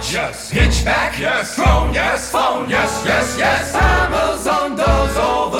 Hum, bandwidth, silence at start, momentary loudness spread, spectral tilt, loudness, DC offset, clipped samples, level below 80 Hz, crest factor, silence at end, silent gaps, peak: none; 16.5 kHz; 0 s; 4 LU; -4 dB/octave; -16 LUFS; under 0.1%; under 0.1%; -24 dBFS; 14 dB; 0 s; none; -2 dBFS